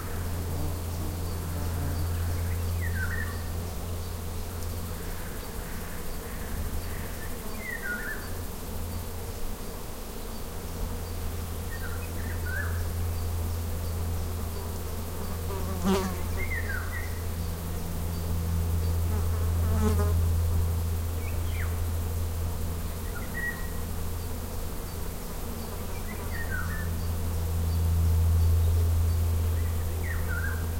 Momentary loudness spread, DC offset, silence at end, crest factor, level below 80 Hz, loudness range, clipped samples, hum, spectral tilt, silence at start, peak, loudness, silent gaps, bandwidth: 11 LU; 0.4%; 0 s; 18 dB; -36 dBFS; 9 LU; under 0.1%; none; -5.5 dB/octave; 0 s; -12 dBFS; -32 LUFS; none; 16.5 kHz